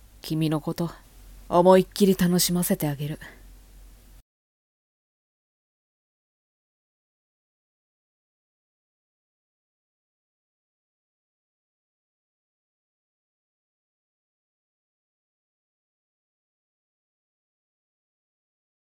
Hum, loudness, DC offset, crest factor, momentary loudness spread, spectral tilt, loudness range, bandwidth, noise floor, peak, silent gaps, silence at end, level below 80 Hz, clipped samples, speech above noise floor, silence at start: none; -23 LUFS; under 0.1%; 26 dB; 15 LU; -5.5 dB/octave; 12 LU; 18 kHz; -49 dBFS; -4 dBFS; none; 15.55 s; -56 dBFS; under 0.1%; 27 dB; 0.25 s